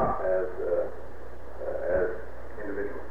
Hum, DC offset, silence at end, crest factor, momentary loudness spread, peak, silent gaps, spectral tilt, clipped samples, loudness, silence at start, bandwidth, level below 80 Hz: none; 3%; 0 s; 16 dB; 16 LU; -14 dBFS; none; -8.5 dB/octave; under 0.1%; -31 LUFS; 0 s; 7 kHz; -46 dBFS